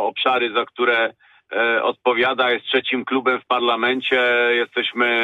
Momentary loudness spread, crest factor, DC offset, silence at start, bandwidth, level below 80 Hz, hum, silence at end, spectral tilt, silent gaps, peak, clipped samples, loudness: 4 LU; 14 dB; under 0.1%; 0 s; 7.2 kHz; -70 dBFS; none; 0 s; -5 dB/octave; none; -6 dBFS; under 0.1%; -19 LUFS